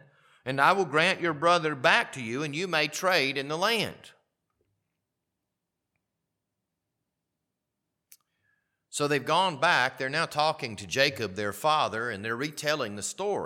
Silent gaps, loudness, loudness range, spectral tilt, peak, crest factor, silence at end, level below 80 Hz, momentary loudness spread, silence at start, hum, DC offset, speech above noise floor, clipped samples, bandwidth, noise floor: none; -26 LUFS; 9 LU; -3.5 dB/octave; -6 dBFS; 24 dB; 0 s; -74 dBFS; 9 LU; 0.45 s; none; under 0.1%; 57 dB; under 0.1%; 18 kHz; -84 dBFS